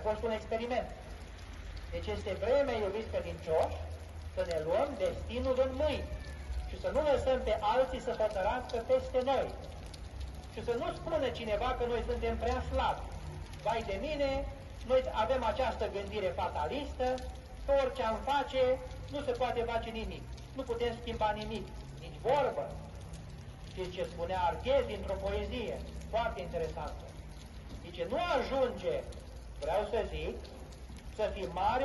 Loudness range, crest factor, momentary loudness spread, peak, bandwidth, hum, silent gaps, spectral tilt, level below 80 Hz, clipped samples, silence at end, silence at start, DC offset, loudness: 4 LU; 18 dB; 15 LU; -18 dBFS; 12 kHz; none; none; -6 dB/octave; -46 dBFS; under 0.1%; 0 s; 0 s; under 0.1%; -35 LUFS